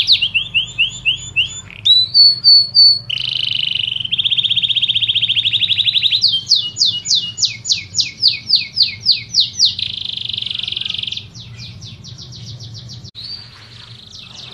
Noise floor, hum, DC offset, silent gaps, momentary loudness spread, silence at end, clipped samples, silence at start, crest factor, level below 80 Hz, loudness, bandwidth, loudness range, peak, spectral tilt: -37 dBFS; none; under 0.1%; none; 24 LU; 0 s; under 0.1%; 0 s; 16 dB; -50 dBFS; -12 LUFS; 12.5 kHz; 14 LU; 0 dBFS; 0.5 dB/octave